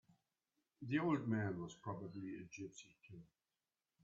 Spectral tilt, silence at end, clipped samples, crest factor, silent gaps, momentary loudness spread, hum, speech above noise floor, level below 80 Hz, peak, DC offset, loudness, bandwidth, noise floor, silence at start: -6.5 dB/octave; 0.8 s; under 0.1%; 20 dB; none; 22 LU; none; over 46 dB; -82 dBFS; -26 dBFS; under 0.1%; -44 LUFS; 7.4 kHz; under -90 dBFS; 0.8 s